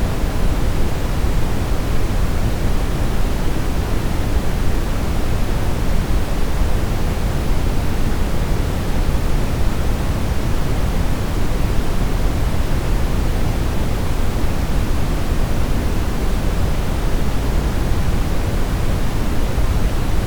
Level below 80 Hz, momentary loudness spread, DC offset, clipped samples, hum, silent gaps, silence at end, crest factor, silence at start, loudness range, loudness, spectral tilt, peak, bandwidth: -20 dBFS; 1 LU; under 0.1%; under 0.1%; none; none; 0 s; 12 dB; 0 s; 0 LU; -22 LUFS; -6 dB/octave; -4 dBFS; over 20 kHz